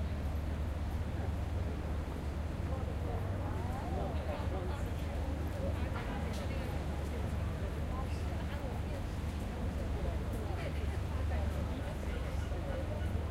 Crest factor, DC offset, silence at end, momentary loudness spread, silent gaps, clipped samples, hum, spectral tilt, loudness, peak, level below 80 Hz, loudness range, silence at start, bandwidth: 14 dB; under 0.1%; 0 s; 2 LU; none; under 0.1%; none; -7 dB/octave; -38 LUFS; -22 dBFS; -40 dBFS; 1 LU; 0 s; 15 kHz